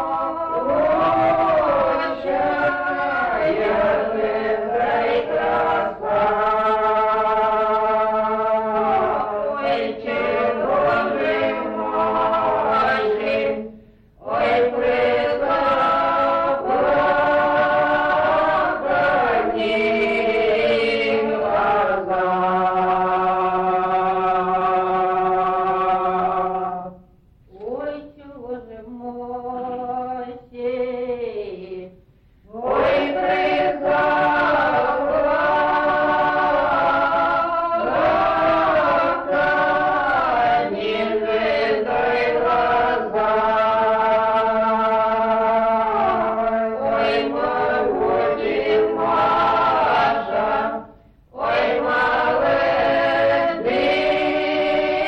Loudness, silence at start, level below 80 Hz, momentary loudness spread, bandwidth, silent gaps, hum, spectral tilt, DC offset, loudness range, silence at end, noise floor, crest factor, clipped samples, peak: -19 LUFS; 0 s; -48 dBFS; 8 LU; 6.6 kHz; none; none; -6.5 dB/octave; under 0.1%; 5 LU; 0 s; -52 dBFS; 10 dB; under 0.1%; -10 dBFS